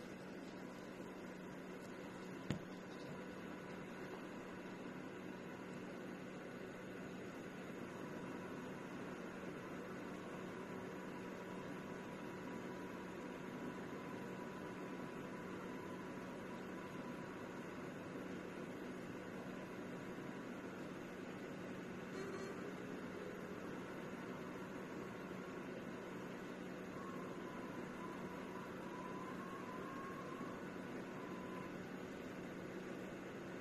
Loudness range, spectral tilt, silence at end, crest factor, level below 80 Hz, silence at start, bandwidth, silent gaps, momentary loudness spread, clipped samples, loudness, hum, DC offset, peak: 2 LU; -6 dB/octave; 0 s; 26 dB; -76 dBFS; 0 s; 13 kHz; none; 2 LU; under 0.1%; -50 LUFS; none; under 0.1%; -24 dBFS